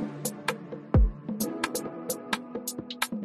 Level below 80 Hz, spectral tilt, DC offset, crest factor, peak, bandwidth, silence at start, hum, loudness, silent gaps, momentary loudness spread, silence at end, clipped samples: -34 dBFS; -4.5 dB/octave; under 0.1%; 18 dB; -12 dBFS; 14.5 kHz; 0 s; none; -31 LUFS; none; 10 LU; 0 s; under 0.1%